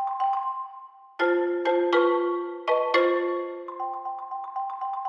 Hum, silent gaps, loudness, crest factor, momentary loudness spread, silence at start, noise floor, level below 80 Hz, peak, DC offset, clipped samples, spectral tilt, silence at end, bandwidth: none; none; -26 LUFS; 18 dB; 13 LU; 0 s; -46 dBFS; under -90 dBFS; -8 dBFS; under 0.1%; under 0.1%; -3 dB/octave; 0 s; 6.2 kHz